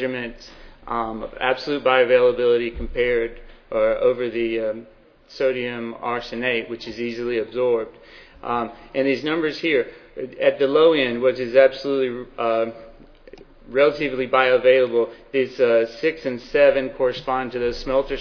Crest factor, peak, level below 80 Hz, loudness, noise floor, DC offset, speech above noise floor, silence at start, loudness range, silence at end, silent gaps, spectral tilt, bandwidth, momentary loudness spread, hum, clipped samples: 20 dB; -2 dBFS; -44 dBFS; -21 LUFS; -45 dBFS; under 0.1%; 24 dB; 0 s; 6 LU; 0 s; none; -6 dB/octave; 5.4 kHz; 12 LU; none; under 0.1%